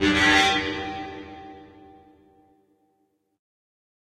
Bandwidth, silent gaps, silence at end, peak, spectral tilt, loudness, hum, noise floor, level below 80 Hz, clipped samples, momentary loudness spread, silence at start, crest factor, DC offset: 13 kHz; none; 2.4 s; -6 dBFS; -3 dB/octave; -21 LUFS; none; -71 dBFS; -50 dBFS; under 0.1%; 25 LU; 0 s; 20 dB; under 0.1%